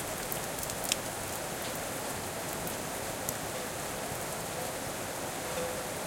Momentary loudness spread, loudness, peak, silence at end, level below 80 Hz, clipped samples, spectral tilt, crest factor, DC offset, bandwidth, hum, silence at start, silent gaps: 4 LU; -35 LUFS; -8 dBFS; 0 s; -56 dBFS; under 0.1%; -2.5 dB/octave; 28 dB; under 0.1%; 17 kHz; none; 0 s; none